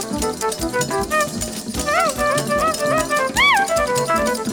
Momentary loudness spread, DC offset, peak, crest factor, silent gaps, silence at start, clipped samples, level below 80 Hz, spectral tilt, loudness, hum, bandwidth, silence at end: 9 LU; under 0.1%; -4 dBFS; 16 dB; none; 0 s; under 0.1%; -38 dBFS; -3 dB/octave; -18 LUFS; none; over 20 kHz; 0 s